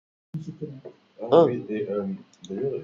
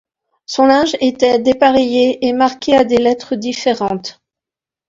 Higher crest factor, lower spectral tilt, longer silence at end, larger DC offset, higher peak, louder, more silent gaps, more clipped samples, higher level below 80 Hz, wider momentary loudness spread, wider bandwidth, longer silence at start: first, 22 dB vs 14 dB; first, -8 dB/octave vs -4.5 dB/octave; second, 0 s vs 0.8 s; neither; second, -4 dBFS vs 0 dBFS; second, -24 LUFS vs -14 LUFS; neither; neither; second, -70 dBFS vs -50 dBFS; first, 20 LU vs 9 LU; about the same, 7.2 kHz vs 7.8 kHz; second, 0.35 s vs 0.5 s